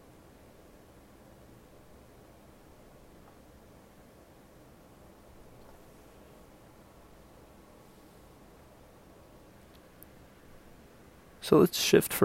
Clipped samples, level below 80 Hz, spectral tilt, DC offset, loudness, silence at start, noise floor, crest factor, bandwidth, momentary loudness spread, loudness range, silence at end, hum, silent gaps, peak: under 0.1%; -62 dBFS; -4.5 dB/octave; under 0.1%; -25 LUFS; 11.4 s; -56 dBFS; 28 dB; 16 kHz; 30 LU; 23 LU; 0 s; none; none; -8 dBFS